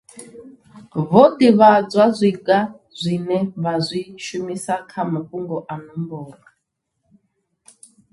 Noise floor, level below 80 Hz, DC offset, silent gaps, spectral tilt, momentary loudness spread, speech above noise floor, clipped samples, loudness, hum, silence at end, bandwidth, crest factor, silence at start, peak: -75 dBFS; -62 dBFS; under 0.1%; none; -6.5 dB/octave; 18 LU; 58 dB; under 0.1%; -18 LUFS; none; 1.8 s; 11.5 kHz; 20 dB; 0.15 s; 0 dBFS